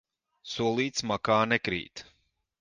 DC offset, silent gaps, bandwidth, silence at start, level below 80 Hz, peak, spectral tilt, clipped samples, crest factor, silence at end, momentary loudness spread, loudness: under 0.1%; none; 10.5 kHz; 0.45 s; -62 dBFS; -10 dBFS; -4 dB/octave; under 0.1%; 20 dB; 0.6 s; 19 LU; -28 LUFS